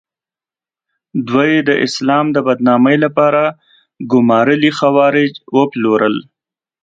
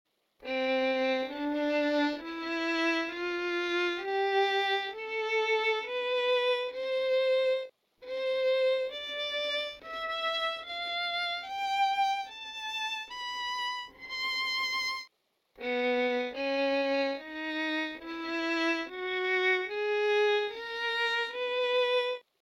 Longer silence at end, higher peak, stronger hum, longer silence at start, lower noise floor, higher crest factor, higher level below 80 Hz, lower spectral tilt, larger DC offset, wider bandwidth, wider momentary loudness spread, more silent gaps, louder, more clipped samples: first, 0.6 s vs 0.25 s; first, 0 dBFS vs -16 dBFS; neither; first, 1.15 s vs 0.4 s; first, under -90 dBFS vs -72 dBFS; about the same, 14 dB vs 16 dB; first, -60 dBFS vs -70 dBFS; first, -6 dB/octave vs -2 dB/octave; neither; second, 7.8 kHz vs 15.5 kHz; about the same, 6 LU vs 8 LU; neither; first, -13 LUFS vs -30 LUFS; neither